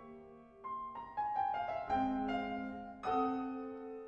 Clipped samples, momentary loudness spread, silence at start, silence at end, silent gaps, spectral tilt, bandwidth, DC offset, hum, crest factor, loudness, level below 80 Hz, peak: under 0.1%; 12 LU; 0 s; 0 s; none; -7 dB/octave; 7 kHz; under 0.1%; none; 16 dB; -39 LUFS; -64 dBFS; -24 dBFS